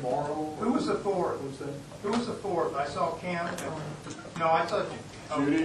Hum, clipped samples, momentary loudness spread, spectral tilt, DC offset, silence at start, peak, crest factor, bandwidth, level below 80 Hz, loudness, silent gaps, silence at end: none; under 0.1%; 12 LU; -5.5 dB/octave; under 0.1%; 0 s; -12 dBFS; 18 dB; 12.5 kHz; -60 dBFS; -31 LUFS; none; 0 s